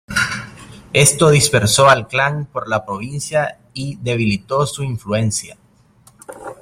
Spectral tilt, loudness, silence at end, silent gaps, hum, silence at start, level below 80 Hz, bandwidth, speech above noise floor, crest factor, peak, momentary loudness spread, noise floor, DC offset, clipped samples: -4 dB/octave; -16 LUFS; 0.1 s; none; none; 0.1 s; -46 dBFS; 16 kHz; 34 dB; 18 dB; 0 dBFS; 15 LU; -51 dBFS; under 0.1%; under 0.1%